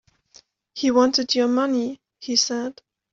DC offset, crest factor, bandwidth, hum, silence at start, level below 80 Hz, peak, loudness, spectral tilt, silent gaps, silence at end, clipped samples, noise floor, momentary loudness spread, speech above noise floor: under 0.1%; 18 dB; 7.8 kHz; none; 0.75 s; -66 dBFS; -6 dBFS; -21 LUFS; -2 dB/octave; none; 0.4 s; under 0.1%; -55 dBFS; 14 LU; 34 dB